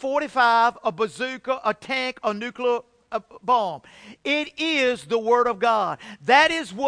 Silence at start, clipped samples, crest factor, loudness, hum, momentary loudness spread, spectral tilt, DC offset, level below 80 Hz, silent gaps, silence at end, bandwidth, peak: 0 s; under 0.1%; 18 dB; -22 LUFS; none; 13 LU; -3.5 dB/octave; under 0.1%; -64 dBFS; none; 0 s; 10.5 kHz; -4 dBFS